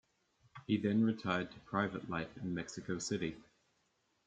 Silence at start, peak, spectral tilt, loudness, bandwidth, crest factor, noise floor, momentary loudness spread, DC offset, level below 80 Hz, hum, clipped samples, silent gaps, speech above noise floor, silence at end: 0.55 s; -18 dBFS; -5.5 dB/octave; -38 LUFS; 9 kHz; 20 dB; -78 dBFS; 9 LU; under 0.1%; -70 dBFS; none; under 0.1%; none; 42 dB; 0.85 s